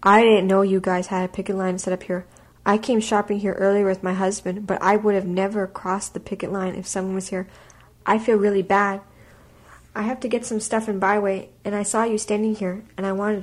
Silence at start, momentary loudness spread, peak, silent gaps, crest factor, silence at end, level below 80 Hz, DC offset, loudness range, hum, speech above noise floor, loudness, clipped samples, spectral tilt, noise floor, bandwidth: 0 s; 10 LU; -4 dBFS; none; 18 dB; 0 s; -56 dBFS; under 0.1%; 3 LU; none; 28 dB; -22 LUFS; under 0.1%; -5 dB/octave; -49 dBFS; 12.5 kHz